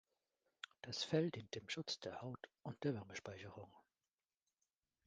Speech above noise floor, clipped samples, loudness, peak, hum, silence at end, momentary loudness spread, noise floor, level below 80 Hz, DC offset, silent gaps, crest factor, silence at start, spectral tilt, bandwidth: over 44 dB; under 0.1%; -46 LUFS; -24 dBFS; none; 1.25 s; 17 LU; under -90 dBFS; -78 dBFS; under 0.1%; none; 24 dB; 0.85 s; -5 dB/octave; 9.6 kHz